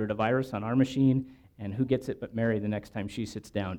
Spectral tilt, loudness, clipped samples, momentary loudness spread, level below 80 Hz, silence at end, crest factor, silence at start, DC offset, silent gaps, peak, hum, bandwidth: -7.5 dB/octave; -30 LUFS; under 0.1%; 11 LU; -58 dBFS; 0 s; 16 dB; 0 s; under 0.1%; none; -12 dBFS; none; 12 kHz